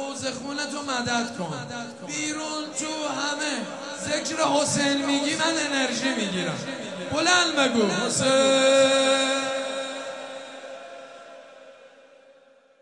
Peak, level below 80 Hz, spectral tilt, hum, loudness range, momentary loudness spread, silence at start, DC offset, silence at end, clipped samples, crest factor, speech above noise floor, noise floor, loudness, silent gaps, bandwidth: -8 dBFS; -68 dBFS; -2.5 dB/octave; none; 8 LU; 16 LU; 0 s; under 0.1%; 0.95 s; under 0.1%; 18 dB; 32 dB; -56 dBFS; -24 LUFS; none; 11.5 kHz